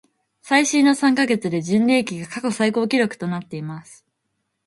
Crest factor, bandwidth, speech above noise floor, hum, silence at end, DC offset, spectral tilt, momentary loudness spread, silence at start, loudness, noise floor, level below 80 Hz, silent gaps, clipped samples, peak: 18 dB; 11.5 kHz; 55 dB; none; 0.75 s; under 0.1%; -4.5 dB/octave; 14 LU; 0.45 s; -19 LUFS; -75 dBFS; -66 dBFS; none; under 0.1%; -2 dBFS